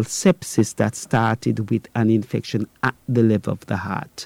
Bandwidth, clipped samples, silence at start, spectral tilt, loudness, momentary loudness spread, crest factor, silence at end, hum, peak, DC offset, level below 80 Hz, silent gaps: 16 kHz; under 0.1%; 0 s; -6 dB/octave; -21 LUFS; 7 LU; 16 dB; 0 s; none; -6 dBFS; under 0.1%; -56 dBFS; none